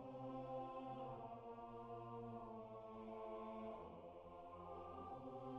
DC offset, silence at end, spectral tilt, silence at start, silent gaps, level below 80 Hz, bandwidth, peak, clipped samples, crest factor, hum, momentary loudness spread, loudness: under 0.1%; 0 s; -7 dB/octave; 0 s; none; -74 dBFS; 6.6 kHz; -40 dBFS; under 0.1%; 14 dB; none; 6 LU; -54 LUFS